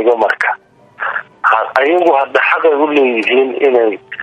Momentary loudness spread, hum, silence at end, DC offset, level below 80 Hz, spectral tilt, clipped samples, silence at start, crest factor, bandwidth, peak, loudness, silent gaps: 9 LU; none; 0 s; under 0.1%; -64 dBFS; -4.5 dB/octave; under 0.1%; 0 s; 12 dB; 9.2 kHz; 0 dBFS; -12 LUFS; none